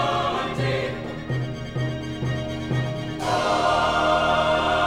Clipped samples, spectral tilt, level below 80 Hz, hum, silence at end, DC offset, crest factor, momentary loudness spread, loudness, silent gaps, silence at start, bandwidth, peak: under 0.1%; -5.5 dB/octave; -42 dBFS; none; 0 s; 0.3%; 14 dB; 9 LU; -24 LUFS; none; 0 s; 12.5 kHz; -8 dBFS